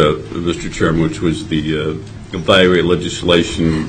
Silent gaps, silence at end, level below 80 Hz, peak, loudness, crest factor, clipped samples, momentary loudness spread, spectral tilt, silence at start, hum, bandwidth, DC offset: none; 0 s; -34 dBFS; 0 dBFS; -15 LUFS; 16 dB; under 0.1%; 11 LU; -5.5 dB/octave; 0 s; none; 10.5 kHz; 0.2%